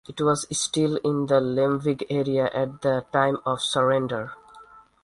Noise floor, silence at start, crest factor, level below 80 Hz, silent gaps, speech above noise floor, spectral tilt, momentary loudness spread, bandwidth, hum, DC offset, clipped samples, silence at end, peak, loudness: -50 dBFS; 0.1 s; 18 dB; -60 dBFS; none; 26 dB; -4.5 dB/octave; 4 LU; 11.5 kHz; none; under 0.1%; under 0.1%; 0.25 s; -6 dBFS; -24 LUFS